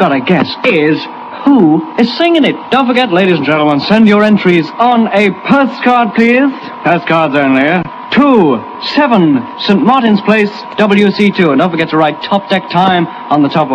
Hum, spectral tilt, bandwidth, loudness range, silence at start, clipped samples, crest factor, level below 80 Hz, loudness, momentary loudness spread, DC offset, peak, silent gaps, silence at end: none; -7 dB/octave; 9 kHz; 1 LU; 0 s; 1%; 10 dB; -52 dBFS; -10 LUFS; 6 LU; under 0.1%; 0 dBFS; none; 0 s